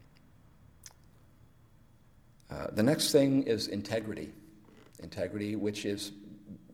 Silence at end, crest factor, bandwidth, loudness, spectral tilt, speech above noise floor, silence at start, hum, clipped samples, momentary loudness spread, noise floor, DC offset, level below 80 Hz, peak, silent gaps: 0.15 s; 22 dB; 17 kHz; -31 LUFS; -5 dB/octave; 29 dB; 0.85 s; none; under 0.1%; 25 LU; -60 dBFS; under 0.1%; -64 dBFS; -12 dBFS; none